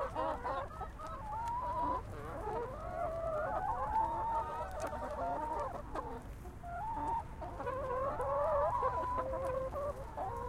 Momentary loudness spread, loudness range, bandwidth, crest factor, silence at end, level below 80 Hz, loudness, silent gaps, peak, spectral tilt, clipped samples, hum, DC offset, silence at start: 10 LU; 3 LU; 16 kHz; 16 dB; 0 s; -50 dBFS; -39 LUFS; none; -22 dBFS; -6.5 dB/octave; under 0.1%; none; under 0.1%; 0 s